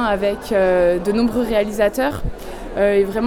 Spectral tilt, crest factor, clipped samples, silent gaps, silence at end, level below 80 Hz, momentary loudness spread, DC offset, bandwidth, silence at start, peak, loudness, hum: -6 dB/octave; 14 dB; under 0.1%; none; 0 s; -34 dBFS; 13 LU; under 0.1%; 18 kHz; 0 s; -4 dBFS; -18 LUFS; none